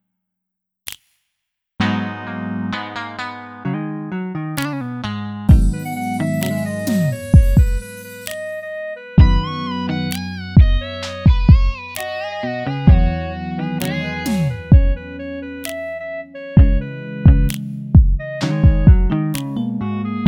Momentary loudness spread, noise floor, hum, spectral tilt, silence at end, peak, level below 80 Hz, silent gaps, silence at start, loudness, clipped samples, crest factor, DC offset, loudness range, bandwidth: 14 LU; -80 dBFS; none; -7 dB/octave; 0 s; 0 dBFS; -20 dBFS; none; 0.85 s; -18 LUFS; under 0.1%; 16 dB; under 0.1%; 9 LU; 17.5 kHz